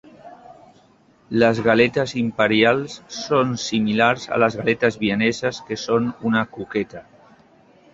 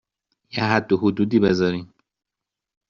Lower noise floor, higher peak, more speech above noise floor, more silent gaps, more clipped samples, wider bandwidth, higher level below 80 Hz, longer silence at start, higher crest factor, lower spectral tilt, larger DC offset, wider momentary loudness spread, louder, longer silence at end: second, -55 dBFS vs -86 dBFS; about the same, -2 dBFS vs -2 dBFS; second, 35 dB vs 66 dB; neither; neither; about the same, 7.8 kHz vs 7.4 kHz; about the same, -56 dBFS vs -56 dBFS; second, 0.25 s vs 0.55 s; about the same, 20 dB vs 20 dB; about the same, -5 dB/octave vs -5.5 dB/octave; neither; about the same, 10 LU vs 10 LU; about the same, -20 LUFS vs -20 LUFS; second, 0.9 s vs 1.05 s